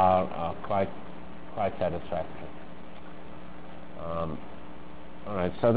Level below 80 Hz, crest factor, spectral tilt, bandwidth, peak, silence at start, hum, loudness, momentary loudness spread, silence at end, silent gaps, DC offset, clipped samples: -50 dBFS; 22 dB; -10.5 dB/octave; 4 kHz; -10 dBFS; 0 s; none; -32 LUFS; 17 LU; 0 s; none; 2%; under 0.1%